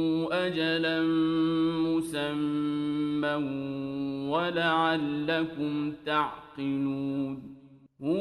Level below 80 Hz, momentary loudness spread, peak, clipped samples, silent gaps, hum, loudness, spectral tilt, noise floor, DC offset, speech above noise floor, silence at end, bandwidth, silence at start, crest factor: -64 dBFS; 8 LU; -12 dBFS; under 0.1%; none; none; -29 LUFS; -6.5 dB/octave; -52 dBFS; under 0.1%; 24 dB; 0 s; 12 kHz; 0 s; 16 dB